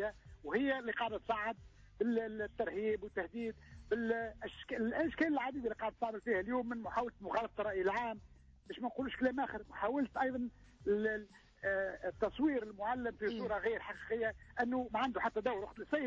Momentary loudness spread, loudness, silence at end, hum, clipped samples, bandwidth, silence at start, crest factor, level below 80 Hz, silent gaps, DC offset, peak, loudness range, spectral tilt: 8 LU; -38 LUFS; 0 s; none; under 0.1%; 8 kHz; 0 s; 14 dB; -62 dBFS; none; under 0.1%; -24 dBFS; 1 LU; -6.5 dB/octave